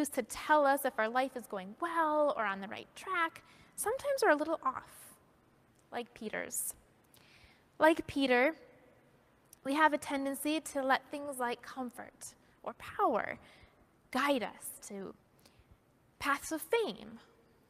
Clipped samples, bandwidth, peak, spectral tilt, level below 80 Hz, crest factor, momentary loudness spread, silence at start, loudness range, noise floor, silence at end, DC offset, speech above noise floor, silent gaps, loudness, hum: under 0.1%; 15.5 kHz; -14 dBFS; -3 dB/octave; -70 dBFS; 22 dB; 18 LU; 0 s; 6 LU; -67 dBFS; 0.5 s; under 0.1%; 33 dB; none; -34 LUFS; none